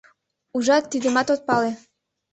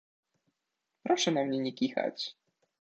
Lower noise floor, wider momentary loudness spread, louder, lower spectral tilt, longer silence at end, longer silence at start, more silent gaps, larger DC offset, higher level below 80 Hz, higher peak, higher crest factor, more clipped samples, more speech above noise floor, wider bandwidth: second, -60 dBFS vs -85 dBFS; second, 9 LU vs 12 LU; first, -22 LUFS vs -31 LUFS; about the same, -3.5 dB/octave vs -4 dB/octave; about the same, 0.55 s vs 0.55 s; second, 0.55 s vs 1.05 s; neither; neither; first, -66 dBFS vs -82 dBFS; first, -4 dBFS vs -16 dBFS; about the same, 18 dB vs 18 dB; neither; second, 39 dB vs 54 dB; about the same, 8.4 kHz vs 8.6 kHz